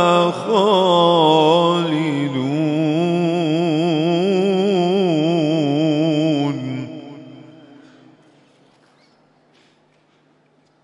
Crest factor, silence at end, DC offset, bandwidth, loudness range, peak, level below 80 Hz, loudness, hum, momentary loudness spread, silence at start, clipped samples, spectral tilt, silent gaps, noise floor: 18 dB; 3.4 s; under 0.1%; 11 kHz; 9 LU; 0 dBFS; -70 dBFS; -17 LUFS; none; 9 LU; 0 s; under 0.1%; -6.5 dB/octave; none; -58 dBFS